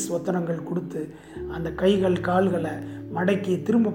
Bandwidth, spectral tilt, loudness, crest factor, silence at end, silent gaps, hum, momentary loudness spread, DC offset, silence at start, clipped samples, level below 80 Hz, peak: 17 kHz; -6.5 dB/octave; -25 LUFS; 16 dB; 0 s; none; none; 13 LU; under 0.1%; 0 s; under 0.1%; -50 dBFS; -8 dBFS